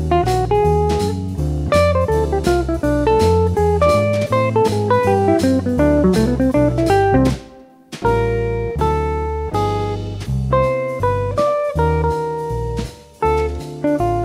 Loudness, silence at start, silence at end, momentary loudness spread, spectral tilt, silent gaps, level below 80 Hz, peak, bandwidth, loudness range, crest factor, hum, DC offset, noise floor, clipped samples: -17 LUFS; 0 s; 0 s; 8 LU; -7 dB/octave; none; -28 dBFS; -2 dBFS; 15.5 kHz; 4 LU; 14 dB; none; under 0.1%; -42 dBFS; under 0.1%